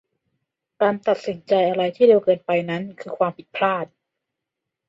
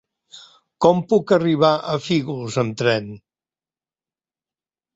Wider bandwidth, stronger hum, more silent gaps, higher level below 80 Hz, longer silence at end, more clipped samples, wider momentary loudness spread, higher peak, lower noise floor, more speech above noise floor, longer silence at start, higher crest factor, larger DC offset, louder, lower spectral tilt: about the same, 7.6 kHz vs 8 kHz; neither; neither; second, -70 dBFS vs -60 dBFS; second, 1.05 s vs 1.8 s; neither; first, 12 LU vs 8 LU; about the same, -4 dBFS vs -2 dBFS; second, -83 dBFS vs under -90 dBFS; second, 63 dB vs over 71 dB; first, 0.8 s vs 0.35 s; about the same, 18 dB vs 20 dB; neither; about the same, -21 LUFS vs -19 LUFS; about the same, -7 dB/octave vs -6 dB/octave